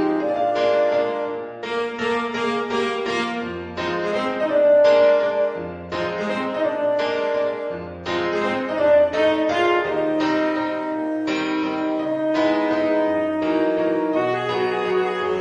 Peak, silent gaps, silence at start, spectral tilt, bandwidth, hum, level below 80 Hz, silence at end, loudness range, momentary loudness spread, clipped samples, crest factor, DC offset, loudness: -6 dBFS; none; 0 s; -5.5 dB/octave; 9.4 kHz; none; -58 dBFS; 0 s; 4 LU; 9 LU; under 0.1%; 14 dB; under 0.1%; -21 LUFS